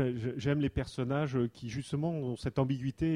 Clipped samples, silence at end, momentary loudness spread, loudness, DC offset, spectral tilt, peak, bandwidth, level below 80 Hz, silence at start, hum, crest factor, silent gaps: under 0.1%; 0 s; 4 LU; -34 LUFS; under 0.1%; -7.5 dB/octave; -16 dBFS; 11 kHz; -52 dBFS; 0 s; none; 16 dB; none